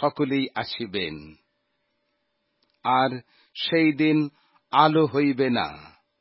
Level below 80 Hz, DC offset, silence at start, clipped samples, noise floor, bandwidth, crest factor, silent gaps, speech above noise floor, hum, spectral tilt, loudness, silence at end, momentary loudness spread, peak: -62 dBFS; under 0.1%; 0 s; under 0.1%; -74 dBFS; 5.8 kHz; 22 dB; none; 51 dB; none; -10.5 dB/octave; -23 LUFS; 0.35 s; 13 LU; -2 dBFS